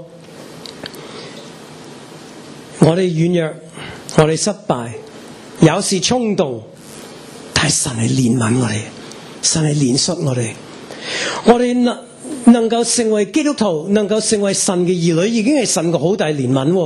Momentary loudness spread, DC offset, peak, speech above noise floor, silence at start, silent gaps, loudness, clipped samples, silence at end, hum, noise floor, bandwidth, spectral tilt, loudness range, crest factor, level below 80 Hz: 21 LU; under 0.1%; 0 dBFS; 21 dB; 0 s; none; -15 LUFS; under 0.1%; 0 s; none; -36 dBFS; 12.5 kHz; -4.5 dB/octave; 4 LU; 16 dB; -50 dBFS